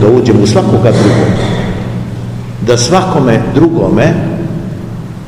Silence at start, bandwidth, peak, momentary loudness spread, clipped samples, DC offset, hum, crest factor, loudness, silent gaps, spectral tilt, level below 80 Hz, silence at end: 0 s; 12 kHz; 0 dBFS; 12 LU; 2%; 0.7%; none; 10 dB; -10 LUFS; none; -6.5 dB/octave; -30 dBFS; 0 s